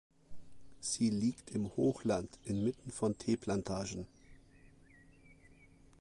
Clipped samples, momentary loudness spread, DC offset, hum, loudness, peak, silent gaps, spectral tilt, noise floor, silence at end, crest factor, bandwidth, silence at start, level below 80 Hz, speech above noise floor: under 0.1%; 9 LU; under 0.1%; none; -37 LUFS; -22 dBFS; none; -5.5 dB/octave; -62 dBFS; 0.65 s; 18 dB; 11.5 kHz; 0.3 s; -62 dBFS; 26 dB